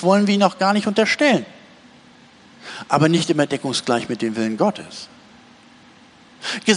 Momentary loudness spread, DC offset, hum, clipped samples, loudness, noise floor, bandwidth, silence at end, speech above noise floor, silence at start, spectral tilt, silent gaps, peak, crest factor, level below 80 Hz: 19 LU; under 0.1%; none; under 0.1%; -19 LUFS; -48 dBFS; 10.5 kHz; 0 s; 30 dB; 0 s; -5 dB/octave; none; -2 dBFS; 18 dB; -64 dBFS